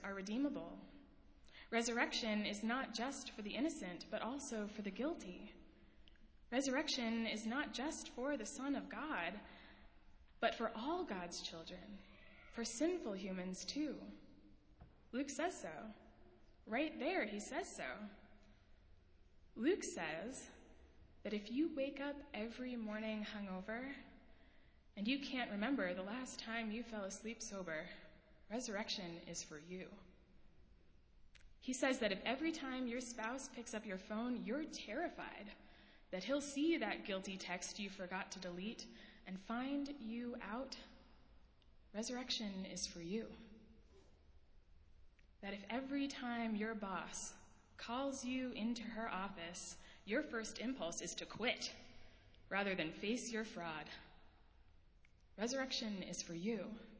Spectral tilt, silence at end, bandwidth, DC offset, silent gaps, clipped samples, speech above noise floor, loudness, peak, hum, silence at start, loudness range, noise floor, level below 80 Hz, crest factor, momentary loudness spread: -3.5 dB/octave; 0 s; 8 kHz; under 0.1%; none; under 0.1%; 23 dB; -44 LUFS; -22 dBFS; none; 0 s; 5 LU; -67 dBFS; -68 dBFS; 24 dB; 15 LU